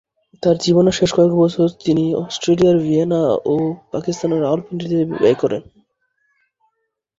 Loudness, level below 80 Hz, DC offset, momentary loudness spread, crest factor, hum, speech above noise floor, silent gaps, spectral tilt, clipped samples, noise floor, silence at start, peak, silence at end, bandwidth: -17 LUFS; -52 dBFS; under 0.1%; 8 LU; 16 dB; none; 56 dB; none; -6.5 dB/octave; under 0.1%; -72 dBFS; 0.45 s; -2 dBFS; 1.6 s; 7.8 kHz